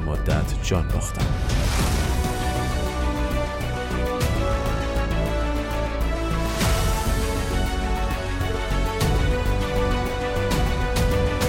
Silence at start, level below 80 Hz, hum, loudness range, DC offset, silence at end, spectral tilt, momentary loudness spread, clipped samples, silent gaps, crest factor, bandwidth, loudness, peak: 0 s; -26 dBFS; none; 1 LU; under 0.1%; 0 s; -5 dB/octave; 4 LU; under 0.1%; none; 14 dB; 16.5 kHz; -24 LUFS; -8 dBFS